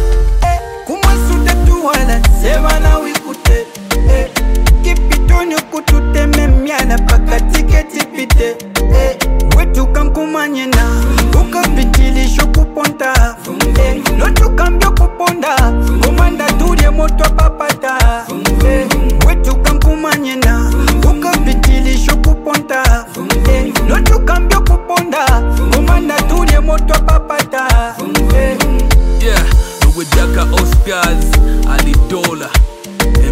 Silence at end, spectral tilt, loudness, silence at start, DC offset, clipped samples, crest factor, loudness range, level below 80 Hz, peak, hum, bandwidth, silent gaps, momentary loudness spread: 0 s; -5 dB/octave; -12 LUFS; 0 s; under 0.1%; under 0.1%; 10 dB; 1 LU; -10 dBFS; 0 dBFS; none; 16 kHz; none; 3 LU